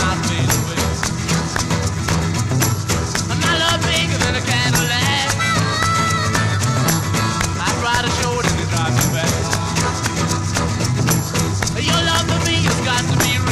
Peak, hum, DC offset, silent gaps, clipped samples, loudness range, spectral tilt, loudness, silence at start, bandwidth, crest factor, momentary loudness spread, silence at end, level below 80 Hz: -4 dBFS; none; 0.3%; none; under 0.1%; 2 LU; -3.5 dB/octave; -17 LUFS; 0 s; 15.5 kHz; 14 dB; 4 LU; 0 s; -34 dBFS